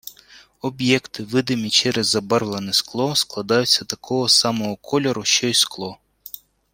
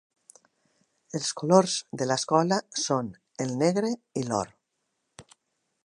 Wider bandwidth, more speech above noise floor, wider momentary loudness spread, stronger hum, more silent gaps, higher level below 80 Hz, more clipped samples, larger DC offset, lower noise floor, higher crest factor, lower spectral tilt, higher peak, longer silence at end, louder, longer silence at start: first, 16.5 kHz vs 11.5 kHz; second, 29 dB vs 53 dB; first, 16 LU vs 11 LU; neither; neither; first, -60 dBFS vs -70 dBFS; neither; neither; second, -49 dBFS vs -79 dBFS; about the same, 20 dB vs 24 dB; second, -3 dB/octave vs -4.5 dB/octave; about the same, -2 dBFS vs -4 dBFS; second, 0.35 s vs 0.65 s; first, -19 LUFS vs -27 LUFS; second, 0.05 s vs 1.15 s